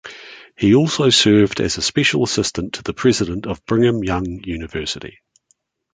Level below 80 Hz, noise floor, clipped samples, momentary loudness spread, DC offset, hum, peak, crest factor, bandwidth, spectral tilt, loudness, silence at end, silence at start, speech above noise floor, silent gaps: -42 dBFS; -64 dBFS; under 0.1%; 14 LU; under 0.1%; none; -2 dBFS; 16 dB; 9.6 kHz; -4.5 dB/octave; -17 LUFS; 0.85 s; 0.05 s; 47 dB; none